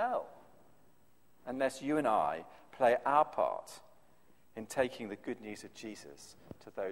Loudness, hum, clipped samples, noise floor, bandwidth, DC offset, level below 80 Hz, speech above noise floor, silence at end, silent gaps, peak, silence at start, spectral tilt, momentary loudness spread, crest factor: -34 LUFS; none; under 0.1%; -70 dBFS; 16 kHz; under 0.1%; -72 dBFS; 35 dB; 0 s; none; -14 dBFS; 0 s; -4.5 dB/octave; 23 LU; 22 dB